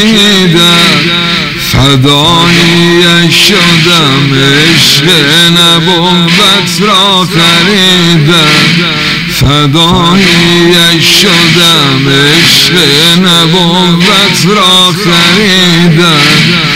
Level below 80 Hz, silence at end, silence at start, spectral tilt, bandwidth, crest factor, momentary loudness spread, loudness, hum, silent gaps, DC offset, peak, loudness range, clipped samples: -30 dBFS; 0 s; 0 s; -3.5 dB/octave; 16.5 kHz; 4 dB; 3 LU; -3 LUFS; none; none; 1%; 0 dBFS; 1 LU; 6%